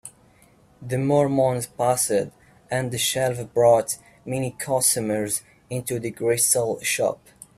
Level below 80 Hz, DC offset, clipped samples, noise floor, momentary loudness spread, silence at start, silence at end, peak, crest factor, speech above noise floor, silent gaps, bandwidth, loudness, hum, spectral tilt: -60 dBFS; under 0.1%; under 0.1%; -56 dBFS; 12 LU; 0.05 s; 0.4 s; -6 dBFS; 18 dB; 33 dB; none; 16 kHz; -22 LUFS; none; -4 dB/octave